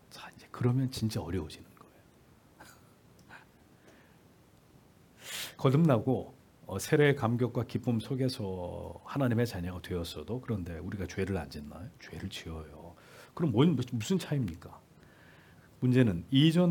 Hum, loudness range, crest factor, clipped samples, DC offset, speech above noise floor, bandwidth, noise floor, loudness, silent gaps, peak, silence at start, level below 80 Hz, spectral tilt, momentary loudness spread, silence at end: none; 9 LU; 22 dB; under 0.1%; under 0.1%; 30 dB; 18 kHz; -61 dBFS; -31 LUFS; none; -12 dBFS; 0.15 s; -62 dBFS; -6.5 dB/octave; 21 LU; 0 s